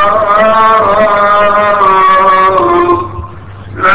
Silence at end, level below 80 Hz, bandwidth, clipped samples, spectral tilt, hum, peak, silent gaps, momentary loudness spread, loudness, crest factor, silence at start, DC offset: 0 s; -34 dBFS; 4 kHz; 0.6%; -8.5 dB/octave; none; 0 dBFS; none; 13 LU; -7 LUFS; 8 dB; 0 s; 3%